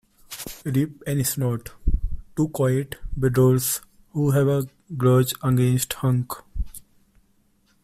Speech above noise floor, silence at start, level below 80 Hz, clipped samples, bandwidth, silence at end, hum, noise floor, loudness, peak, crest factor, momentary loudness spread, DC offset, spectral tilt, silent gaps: 41 dB; 0.3 s; -34 dBFS; under 0.1%; 16 kHz; 1.05 s; none; -63 dBFS; -23 LUFS; -6 dBFS; 16 dB; 15 LU; under 0.1%; -6 dB/octave; none